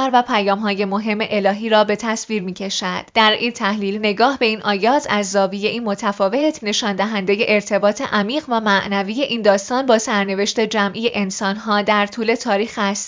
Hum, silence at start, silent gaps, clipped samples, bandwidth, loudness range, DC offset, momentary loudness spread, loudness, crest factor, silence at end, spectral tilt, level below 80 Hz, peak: none; 0 s; none; under 0.1%; 7.6 kHz; 1 LU; under 0.1%; 5 LU; -18 LUFS; 18 dB; 0 s; -4 dB/octave; -60 dBFS; 0 dBFS